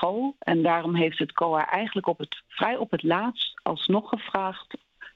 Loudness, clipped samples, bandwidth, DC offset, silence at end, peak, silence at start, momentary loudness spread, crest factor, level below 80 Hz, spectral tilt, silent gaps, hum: -26 LUFS; under 0.1%; 6.4 kHz; under 0.1%; 0.05 s; -6 dBFS; 0 s; 9 LU; 20 dB; -68 dBFS; -8 dB/octave; none; none